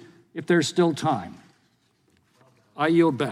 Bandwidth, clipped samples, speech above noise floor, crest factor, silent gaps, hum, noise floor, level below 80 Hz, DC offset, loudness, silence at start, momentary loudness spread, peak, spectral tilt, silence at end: 12 kHz; under 0.1%; 44 dB; 16 dB; none; none; -66 dBFS; -70 dBFS; under 0.1%; -23 LUFS; 0.35 s; 18 LU; -8 dBFS; -5.5 dB/octave; 0 s